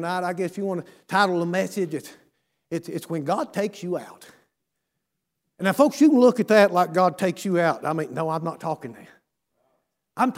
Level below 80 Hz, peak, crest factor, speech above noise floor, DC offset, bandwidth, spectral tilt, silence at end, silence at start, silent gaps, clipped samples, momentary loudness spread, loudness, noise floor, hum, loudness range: -76 dBFS; -4 dBFS; 20 dB; 58 dB; under 0.1%; 16 kHz; -6 dB/octave; 0 s; 0 s; none; under 0.1%; 15 LU; -23 LUFS; -80 dBFS; none; 11 LU